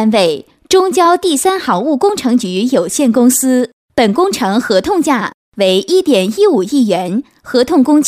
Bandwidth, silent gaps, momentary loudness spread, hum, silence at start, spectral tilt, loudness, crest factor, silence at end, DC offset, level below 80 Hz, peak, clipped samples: 16 kHz; 3.73-3.88 s, 5.34-5.52 s; 6 LU; none; 0 s; -4 dB/octave; -12 LUFS; 12 dB; 0 s; under 0.1%; -50 dBFS; 0 dBFS; under 0.1%